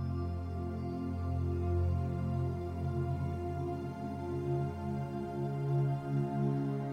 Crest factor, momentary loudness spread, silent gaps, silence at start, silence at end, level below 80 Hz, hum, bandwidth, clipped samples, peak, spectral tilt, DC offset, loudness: 12 dB; 6 LU; none; 0 s; 0 s; -48 dBFS; none; 8.2 kHz; under 0.1%; -22 dBFS; -9.5 dB/octave; under 0.1%; -36 LUFS